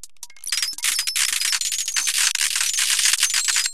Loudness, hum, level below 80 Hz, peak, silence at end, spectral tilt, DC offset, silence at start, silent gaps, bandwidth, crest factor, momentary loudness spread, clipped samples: -19 LUFS; none; -68 dBFS; -2 dBFS; 0 s; 5.5 dB/octave; 1%; 0.2 s; none; 16 kHz; 20 dB; 6 LU; under 0.1%